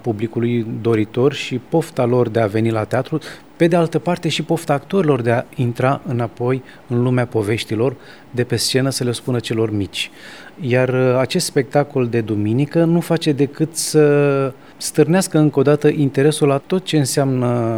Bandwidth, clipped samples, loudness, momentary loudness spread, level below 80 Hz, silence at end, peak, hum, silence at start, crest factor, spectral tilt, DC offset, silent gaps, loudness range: 19.5 kHz; under 0.1%; -18 LUFS; 8 LU; -58 dBFS; 0 s; 0 dBFS; none; 0.05 s; 16 dB; -6 dB/octave; 0.4%; none; 4 LU